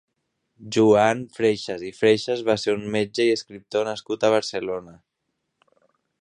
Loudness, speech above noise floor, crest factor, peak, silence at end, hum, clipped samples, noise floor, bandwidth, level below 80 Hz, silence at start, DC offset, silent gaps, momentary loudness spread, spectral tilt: -22 LUFS; 56 dB; 20 dB; -4 dBFS; 1.3 s; none; under 0.1%; -78 dBFS; 10 kHz; -62 dBFS; 0.6 s; under 0.1%; none; 10 LU; -5 dB/octave